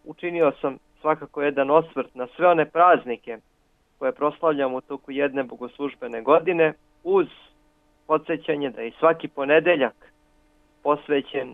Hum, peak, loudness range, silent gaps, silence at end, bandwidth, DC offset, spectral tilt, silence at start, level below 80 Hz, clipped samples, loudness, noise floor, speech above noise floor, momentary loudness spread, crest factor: none; -4 dBFS; 3 LU; none; 0 s; 4 kHz; under 0.1%; -8 dB/octave; 0.05 s; -64 dBFS; under 0.1%; -23 LUFS; -64 dBFS; 42 dB; 13 LU; 20 dB